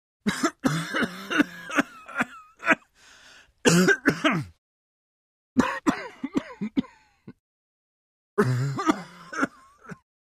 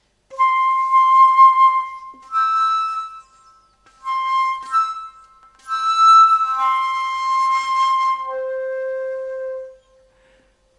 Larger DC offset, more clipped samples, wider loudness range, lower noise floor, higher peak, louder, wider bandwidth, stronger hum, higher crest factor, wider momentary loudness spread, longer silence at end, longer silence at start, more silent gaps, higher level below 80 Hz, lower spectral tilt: neither; neither; about the same, 6 LU vs 7 LU; about the same, -54 dBFS vs -57 dBFS; about the same, -4 dBFS vs -2 dBFS; second, -26 LUFS vs -16 LUFS; first, 15.5 kHz vs 11 kHz; second, none vs 50 Hz at -70 dBFS; first, 24 dB vs 16 dB; second, 10 LU vs 17 LU; second, 0.3 s vs 1.05 s; about the same, 0.25 s vs 0.3 s; first, 4.58-5.56 s, 7.40-8.37 s vs none; about the same, -60 dBFS vs -64 dBFS; first, -4.5 dB/octave vs 1 dB/octave